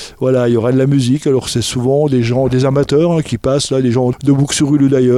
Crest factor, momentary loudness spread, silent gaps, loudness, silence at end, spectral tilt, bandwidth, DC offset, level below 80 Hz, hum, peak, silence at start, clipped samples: 10 dB; 3 LU; none; -13 LUFS; 0 s; -6 dB/octave; 13 kHz; under 0.1%; -40 dBFS; none; -2 dBFS; 0 s; under 0.1%